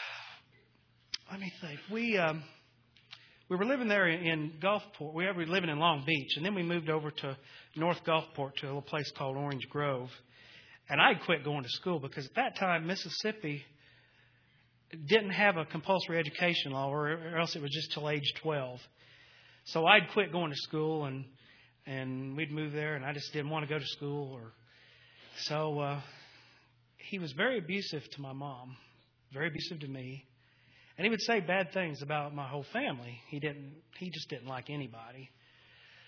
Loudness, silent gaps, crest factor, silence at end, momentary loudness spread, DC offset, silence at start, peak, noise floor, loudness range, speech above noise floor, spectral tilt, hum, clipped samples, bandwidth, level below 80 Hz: -33 LUFS; none; 28 dB; 0.05 s; 18 LU; under 0.1%; 0 s; -8 dBFS; -68 dBFS; 7 LU; 34 dB; -5.5 dB/octave; none; under 0.1%; 5.4 kHz; -78 dBFS